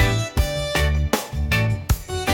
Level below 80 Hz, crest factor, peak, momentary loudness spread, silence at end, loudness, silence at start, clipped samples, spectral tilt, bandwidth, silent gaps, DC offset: -26 dBFS; 16 dB; -6 dBFS; 3 LU; 0 s; -22 LUFS; 0 s; under 0.1%; -4.5 dB/octave; 17 kHz; none; under 0.1%